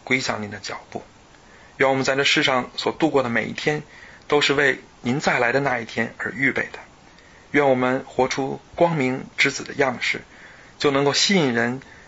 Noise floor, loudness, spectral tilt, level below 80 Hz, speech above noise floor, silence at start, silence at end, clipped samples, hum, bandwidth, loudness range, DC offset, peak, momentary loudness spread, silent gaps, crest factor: -49 dBFS; -21 LUFS; -4 dB/octave; -56 dBFS; 27 dB; 0.05 s; 0.15 s; under 0.1%; none; 8 kHz; 2 LU; under 0.1%; -4 dBFS; 11 LU; none; 18 dB